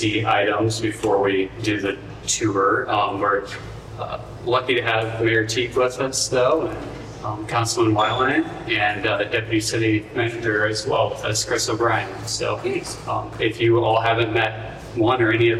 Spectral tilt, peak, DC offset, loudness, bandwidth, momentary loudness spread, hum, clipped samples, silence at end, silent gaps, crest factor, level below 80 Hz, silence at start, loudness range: -4 dB/octave; -6 dBFS; under 0.1%; -21 LUFS; 14 kHz; 10 LU; none; under 0.1%; 0 s; none; 14 dB; -46 dBFS; 0 s; 2 LU